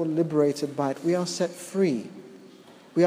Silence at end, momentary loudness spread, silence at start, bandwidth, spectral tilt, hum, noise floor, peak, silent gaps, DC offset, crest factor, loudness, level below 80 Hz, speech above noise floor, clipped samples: 0 s; 16 LU; 0 s; 15.5 kHz; -6 dB/octave; none; -50 dBFS; -8 dBFS; none; under 0.1%; 18 dB; -26 LUFS; -78 dBFS; 24 dB; under 0.1%